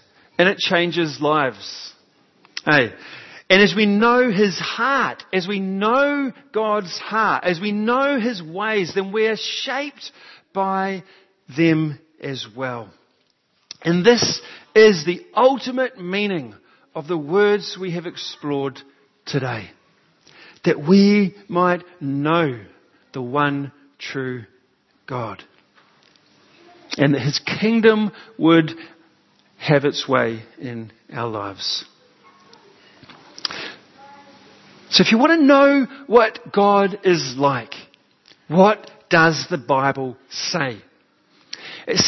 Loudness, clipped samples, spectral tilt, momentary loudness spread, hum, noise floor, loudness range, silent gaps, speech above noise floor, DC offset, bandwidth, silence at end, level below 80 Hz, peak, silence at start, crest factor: -19 LUFS; under 0.1%; -5 dB/octave; 18 LU; none; -65 dBFS; 10 LU; none; 46 dB; under 0.1%; 6.2 kHz; 0 s; -64 dBFS; 0 dBFS; 0.4 s; 20 dB